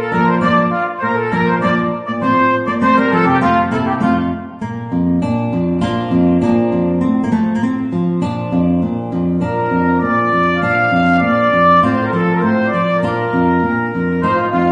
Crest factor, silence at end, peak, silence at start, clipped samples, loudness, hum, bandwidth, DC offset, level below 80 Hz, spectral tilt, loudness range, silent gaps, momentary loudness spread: 14 dB; 0 s; -2 dBFS; 0 s; under 0.1%; -15 LUFS; none; 9 kHz; under 0.1%; -44 dBFS; -8.5 dB/octave; 3 LU; none; 5 LU